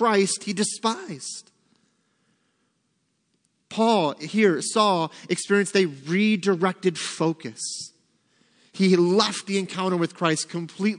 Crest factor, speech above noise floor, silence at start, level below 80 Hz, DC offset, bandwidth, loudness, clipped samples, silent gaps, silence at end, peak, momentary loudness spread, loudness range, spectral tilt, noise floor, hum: 20 dB; 49 dB; 0 s; -78 dBFS; under 0.1%; 10.5 kHz; -23 LUFS; under 0.1%; none; 0 s; -4 dBFS; 11 LU; 8 LU; -4.5 dB/octave; -72 dBFS; none